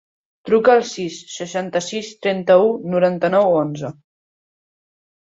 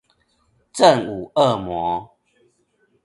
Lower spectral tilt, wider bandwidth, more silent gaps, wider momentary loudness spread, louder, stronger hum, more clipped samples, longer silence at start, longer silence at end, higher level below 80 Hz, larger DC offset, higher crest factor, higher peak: about the same, -5 dB/octave vs -5 dB/octave; second, 8 kHz vs 11.5 kHz; neither; about the same, 14 LU vs 12 LU; about the same, -18 LUFS vs -19 LUFS; neither; neither; second, 0.45 s vs 0.75 s; first, 1.45 s vs 1 s; second, -64 dBFS vs -54 dBFS; neither; about the same, 18 dB vs 20 dB; about the same, -2 dBFS vs 0 dBFS